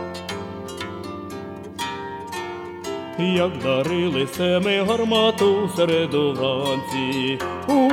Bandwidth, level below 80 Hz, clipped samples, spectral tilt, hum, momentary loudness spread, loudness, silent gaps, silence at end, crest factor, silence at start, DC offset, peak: 17.5 kHz; -56 dBFS; under 0.1%; -5.5 dB/octave; none; 13 LU; -22 LUFS; none; 0 s; 16 dB; 0 s; under 0.1%; -6 dBFS